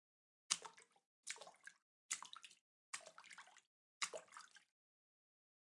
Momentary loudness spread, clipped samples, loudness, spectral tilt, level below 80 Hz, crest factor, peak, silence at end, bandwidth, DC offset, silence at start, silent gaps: 20 LU; under 0.1%; -49 LUFS; 2 dB/octave; under -90 dBFS; 40 dB; -14 dBFS; 1.1 s; 12 kHz; under 0.1%; 0.5 s; 1.06-1.23 s, 1.82-2.09 s, 2.61-2.93 s, 3.67-4.01 s